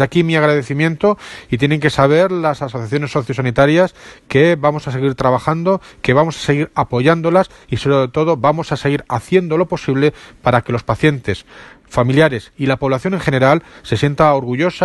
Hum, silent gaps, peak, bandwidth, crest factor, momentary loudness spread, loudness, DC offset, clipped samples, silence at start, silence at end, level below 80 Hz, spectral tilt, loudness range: none; none; 0 dBFS; 12 kHz; 16 dB; 7 LU; -15 LUFS; under 0.1%; under 0.1%; 0 s; 0 s; -44 dBFS; -7 dB/octave; 2 LU